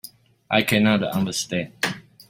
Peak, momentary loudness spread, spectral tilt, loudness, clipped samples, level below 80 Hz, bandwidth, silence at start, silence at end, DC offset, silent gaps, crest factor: -2 dBFS; 9 LU; -4.5 dB/octave; -22 LUFS; under 0.1%; -58 dBFS; 16.5 kHz; 0.05 s; 0.3 s; under 0.1%; none; 20 dB